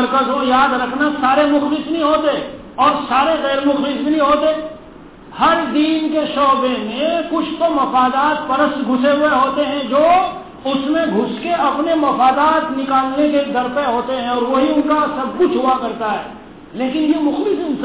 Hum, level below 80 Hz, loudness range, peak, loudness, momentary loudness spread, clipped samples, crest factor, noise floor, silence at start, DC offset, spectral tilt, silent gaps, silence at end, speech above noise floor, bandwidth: none; -48 dBFS; 2 LU; -4 dBFS; -16 LUFS; 6 LU; under 0.1%; 12 dB; -38 dBFS; 0 s; 0.2%; -8.5 dB/octave; none; 0 s; 23 dB; 4 kHz